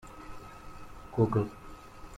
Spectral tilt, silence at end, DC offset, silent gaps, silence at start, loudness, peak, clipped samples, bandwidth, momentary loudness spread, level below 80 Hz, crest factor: -8.5 dB/octave; 0 s; under 0.1%; none; 0.05 s; -31 LUFS; -14 dBFS; under 0.1%; 14 kHz; 21 LU; -52 dBFS; 20 dB